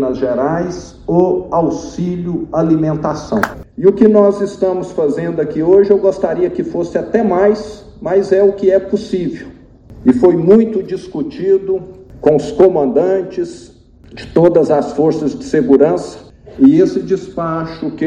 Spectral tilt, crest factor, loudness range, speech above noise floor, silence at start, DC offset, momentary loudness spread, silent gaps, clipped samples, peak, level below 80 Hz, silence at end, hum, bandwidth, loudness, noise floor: -8 dB/octave; 14 dB; 2 LU; 24 dB; 0 s; under 0.1%; 11 LU; none; 0.3%; 0 dBFS; -42 dBFS; 0 s; none; 9.4 kHz; -14 LUFS; -37 dBFS